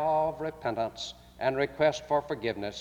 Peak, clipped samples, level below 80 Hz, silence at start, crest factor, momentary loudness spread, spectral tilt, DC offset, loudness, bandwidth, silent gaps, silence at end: -12 dBFS; under 0.1%; -58 dBFS; 0 s; 18 dB; 8 LU; -5 dB/octave; under 0.1%; -31 LUFS; 16 kHz; none; 0 s